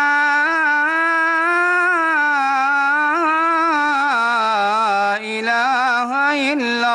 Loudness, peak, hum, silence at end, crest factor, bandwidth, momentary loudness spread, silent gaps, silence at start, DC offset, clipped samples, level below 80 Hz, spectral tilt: -16 LUFS; -8 dBFS; none; 0 s; 10 dB; 11.5 kHz; 3 LU; none; 0 s; under 0.1%; under 0.1%; -70 dBFS; -2.5 dB/octave